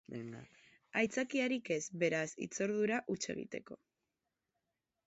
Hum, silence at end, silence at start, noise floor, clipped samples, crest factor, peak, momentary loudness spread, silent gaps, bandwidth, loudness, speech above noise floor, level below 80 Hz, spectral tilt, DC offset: none; 1.3 s; 0.1 s; -89 dBFS; under 0.1%; 20 dB; -20 dBFS; 14 LU; none; 8 kHz; -37 LUFS; 51 dB; -78 dBFS; -4 dB/octave; under 0.1%